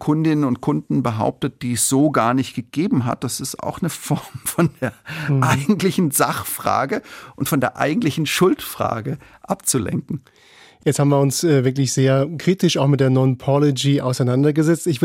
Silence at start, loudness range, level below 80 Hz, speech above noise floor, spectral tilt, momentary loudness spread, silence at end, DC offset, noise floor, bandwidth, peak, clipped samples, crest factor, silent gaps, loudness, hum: 0 s; 4 LU; -56 dBFS; 30 dB; -5.5 dB/octave; 9 LU; 0 s; under 0.1%; -48 dBFS; 16.5 kHz; -2 dBFS; under 0.1%; 16 dB; none; -19 LUFS; none